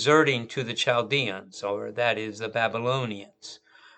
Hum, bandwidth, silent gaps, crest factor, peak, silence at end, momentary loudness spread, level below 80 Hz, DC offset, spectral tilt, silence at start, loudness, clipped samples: none; 9 kHz; none; 20 dB; -6 dBFS; 0.4 s; 15 LU; -76 dBFS; under 0.1%; -4.5 dB/octave; 0 s; -26 LUFS; under 0.1%